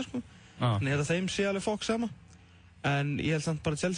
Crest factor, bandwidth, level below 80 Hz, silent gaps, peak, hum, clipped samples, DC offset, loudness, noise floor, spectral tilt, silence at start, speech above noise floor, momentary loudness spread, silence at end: 16 dB; 10.5 kHz; -58 dBFS; none; -16 dBFS; none; under 0.1%; under 0.1%; -31 LUFS; -56 dBFS; -5.5 dB/octave; 0 s; 26 dB; 9 LU; 0 s